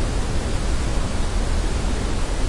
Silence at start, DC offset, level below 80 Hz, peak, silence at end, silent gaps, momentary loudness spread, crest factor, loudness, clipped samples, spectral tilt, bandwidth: 0 s; under 0.1%; -22 dBFS; -8 dBFS; 0 s; none; 1 LU; 12 dB; -25 LUFS; under 0.1%; -5 dB/octave; 11.5 kHz